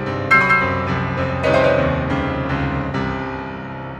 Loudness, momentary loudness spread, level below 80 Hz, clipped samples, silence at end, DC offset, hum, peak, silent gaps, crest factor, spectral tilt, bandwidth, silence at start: -18 LUFS; 12 LU; -36 dBFS; under 0.1%; 0 s; under 0.1%; none; -2 dBFS; none; 16 dB; -7 dB/octave; 9.6 kHz; 0 s